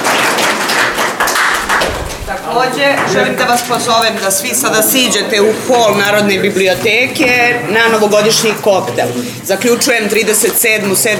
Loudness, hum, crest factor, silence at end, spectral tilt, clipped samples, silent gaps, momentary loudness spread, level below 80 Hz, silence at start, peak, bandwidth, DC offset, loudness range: -11 LUFS; none; 12 dB; 0 s; -2.5 dB/octave; under 0.1%; none; 5 LU; -40 dBFS; 0 s; 0 dBFS; over 20 kHz; under 0.1%; 2 LU